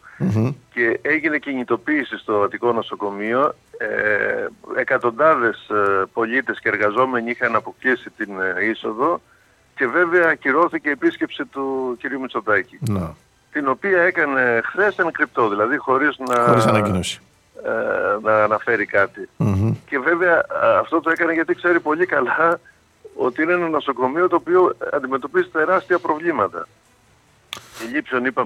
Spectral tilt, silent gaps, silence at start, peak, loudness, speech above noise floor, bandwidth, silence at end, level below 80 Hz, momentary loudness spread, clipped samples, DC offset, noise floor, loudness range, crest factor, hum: -6.5 dB/octave; none; 0.05 s; -4 dBFS; -19 LUFS; 36 dB; 13.5 kHz; 0 s; -60 dBFS; 9 LU; under 0.1%; under 0.1%; -55 dBFS; 3 LU; 16 dB; none